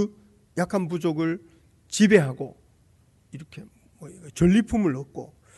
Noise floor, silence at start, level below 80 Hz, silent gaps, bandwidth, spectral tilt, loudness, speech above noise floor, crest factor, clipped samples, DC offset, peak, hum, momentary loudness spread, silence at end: -60 dBFS; 0 s; -50 dBFS; none; 12 kHz; -6 dB/octave; -23 LUFS; 36 dB; 20 dB; under 0.1%; under 0.1%; -6 dBFS; none; 26 LU; 0.3 s